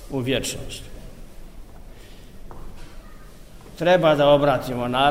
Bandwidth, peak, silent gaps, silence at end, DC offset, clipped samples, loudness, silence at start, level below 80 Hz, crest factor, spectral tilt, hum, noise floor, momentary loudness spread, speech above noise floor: 16 kHz; -4 dBFS; none; 0 s; 0.4%; under 0.1%; -20 LUFS; 0 s; -40 dBFS; 20 dB; -5 dB/octave; none; -42 dBFS; 27 LU; 23 dB